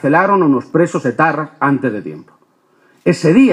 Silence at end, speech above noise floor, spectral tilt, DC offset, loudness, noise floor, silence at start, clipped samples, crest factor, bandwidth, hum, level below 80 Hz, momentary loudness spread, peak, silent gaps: 0 s; 42 dB; -7 dB/octave; under 0.1%; -14 LUFS; -55 dBFS; 0.05 s; under 0.1%; 14 dB; 10.5 kHz; none; -60 dBFS; 9 LU; 0 dBFS; none